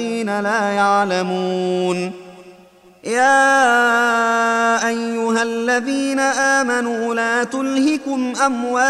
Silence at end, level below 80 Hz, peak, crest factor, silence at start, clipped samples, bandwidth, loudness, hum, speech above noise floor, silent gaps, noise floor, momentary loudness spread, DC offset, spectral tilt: 0 s; -64 dBFS; -2 dBFS; 14 dB; 0 s; under 0.1%; 13.5 kHz; -17 LUFS; none; 30 dB; none; -47 dBFS; 8 LU; under 0.1%; -3.5 dB/octave